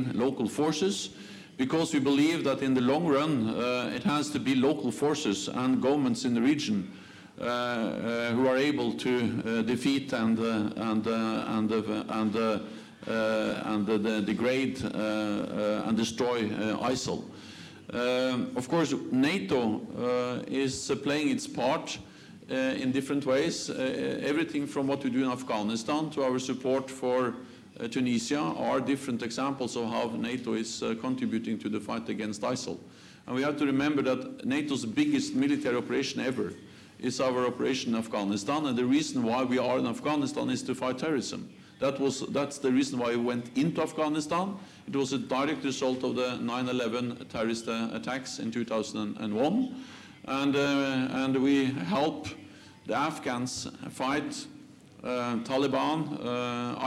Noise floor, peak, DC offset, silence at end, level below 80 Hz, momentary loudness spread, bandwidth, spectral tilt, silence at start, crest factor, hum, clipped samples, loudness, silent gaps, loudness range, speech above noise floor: -51 dBFS; -16 dBFS; under 0.1%; 0 s; -68 dBFS; 8 LU; 13 kHz; -5 dB/octave; 0 s; 14 dB; none; under 0.1%; -30 LUFS; none; 4 LU; 22 dB